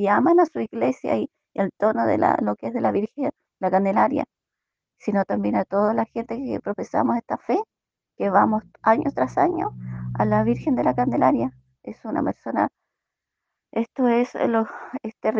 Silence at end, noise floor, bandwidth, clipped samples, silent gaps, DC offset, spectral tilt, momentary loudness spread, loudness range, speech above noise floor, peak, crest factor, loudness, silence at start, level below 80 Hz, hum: 0 s; -85 dBFS; 7.4 kHz; under 0.1%; none; under 0.1%; -8.5 dB/octave; 10 LU; 3 LU; 63 dB; -2 dBFS; 20 dB; -23 LUFS; 0 s; -58 dBFS; none